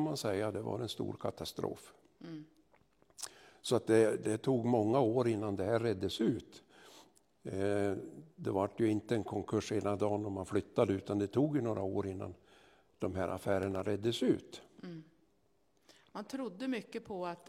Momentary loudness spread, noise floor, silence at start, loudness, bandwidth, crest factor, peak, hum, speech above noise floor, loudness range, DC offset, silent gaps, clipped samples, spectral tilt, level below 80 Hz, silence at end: 18 LU; -75 dBFS; 0 s; -35 LUFS; 16 kHz; 20 dB; -16 dBFS; none; 40 dB; 7 LU; under 0.1%; none; under 0.1%; -6 dB/octave; -72 dBFS; 0.1 s